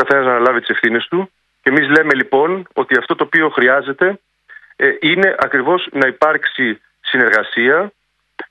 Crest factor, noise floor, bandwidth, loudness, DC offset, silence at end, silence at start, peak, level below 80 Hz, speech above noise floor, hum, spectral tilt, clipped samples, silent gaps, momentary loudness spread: 16 dB; -43 dBFS; 9.4 kHz; -14 LUFS; under 0.1%; 0.05 s; 0 s; 0 dBFS; -64 dBFS; 29 dB; none; -6 dB/octave; under 0.1%; none; 8 LU